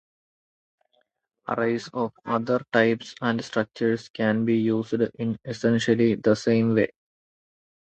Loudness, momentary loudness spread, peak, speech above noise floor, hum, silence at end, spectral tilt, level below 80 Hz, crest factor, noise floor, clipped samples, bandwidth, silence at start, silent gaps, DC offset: -24 LUFS; 8 LU; -6 dBFS; 47 dB; none; 1.05 s; -6.5 dB/octave; -64 dBFS; 20 dB; -71 dBFS; under 0.1%; 8.4 kHz; 1.5 s; 4.10-4.14 s; under 0.1%